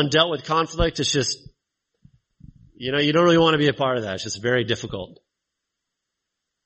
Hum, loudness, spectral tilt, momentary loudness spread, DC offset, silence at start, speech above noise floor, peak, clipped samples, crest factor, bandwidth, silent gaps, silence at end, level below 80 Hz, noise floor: none; -21 LUFS; -4.5 dB/octave; 16 LU; under 0.1%; 0 s; 61 dB; -2 dBFS; under 0.1%; 20 dB; 8.4 kHz; none; 1.5 s; -42 dBFS; -82 dBFS